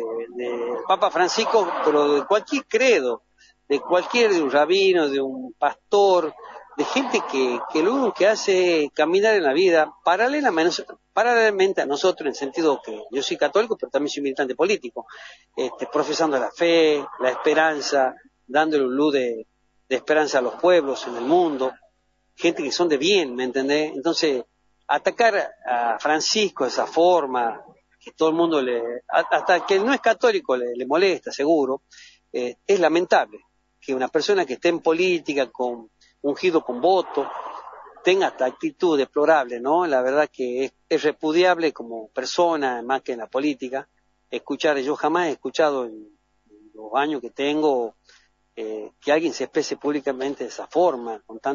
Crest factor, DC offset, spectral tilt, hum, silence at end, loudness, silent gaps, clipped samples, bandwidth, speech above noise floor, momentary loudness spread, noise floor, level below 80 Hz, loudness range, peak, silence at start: 18 dB; under 0.1%; -3.5 dB/octave; none; 0 s; -21 LUFS; none; under 0.1%; 7.6 kHz; 45 dB; 11 LU; -66 dBFS; -72 dBFS; 5 LU; -4 dBFS; 0 s